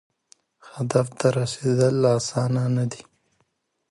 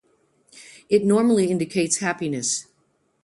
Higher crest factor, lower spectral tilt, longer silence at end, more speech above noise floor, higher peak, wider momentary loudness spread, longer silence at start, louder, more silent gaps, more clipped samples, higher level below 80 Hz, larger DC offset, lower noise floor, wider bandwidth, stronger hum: about the same, 20 dB vs 18 dB; first, -6 dB/octave vs -4.5 dB/octave; first, 0.9 s vs 0.6 s; about the same, 49 dB vs 46 dB; about the same, -4 dBFS vs -6 dBFS; first, 11 LU vs 7 LU; about the same, 0.65 s vs 0.55 s; about the same, -23 LUFS vs -21 LUFS; neither; neither; about the same, -62 dBFS vs -66 dBFS; neither; first, -71 dBFS vs -67 dBFS; about the same, 11.5 kHz vs 11.5 kHz; neither